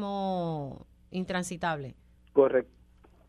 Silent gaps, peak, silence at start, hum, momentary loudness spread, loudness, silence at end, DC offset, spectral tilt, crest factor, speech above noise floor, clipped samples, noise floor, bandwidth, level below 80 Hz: none; -10 dBFS; 0 s; none; 19 LU; -30 LUFS; 0.65 s; under 0.1%; -6 dB/octave; 22 dB; 31 dB; under 0.1%; -59 dBFS; 13 kHz; -58 dBFS